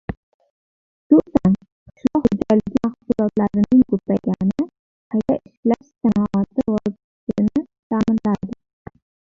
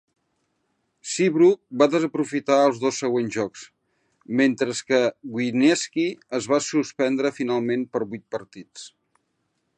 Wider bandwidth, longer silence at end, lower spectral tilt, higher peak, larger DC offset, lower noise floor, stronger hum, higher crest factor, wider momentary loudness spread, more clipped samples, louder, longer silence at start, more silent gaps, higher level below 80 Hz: second, 7.2 kHz vs 10 kHz; second, 0.75 s vs 0.9 s; first, -9.5 dB/octave vs -4.5 dB/octave; about the same, -2 dBFS vs -4 dBFS; neither; first, under -90 dBFS vs -73 dBFS; neither; about the same, 18 dB vs 20 dB; second, 11 LU vs 15 LU; neither; first, -20 LUFS vs -23 LUFS; second, 0.1 s vs 1.05 s; first, 0.17-0.40 s, 0.50-1.10 s, 1.72-1.86 s, 4.79-5.10 s, 5.57-5.63 s, 7.04-7.27 s, 7.79-7.90 s vs none; first, -46 dBFS vs -72 dBFS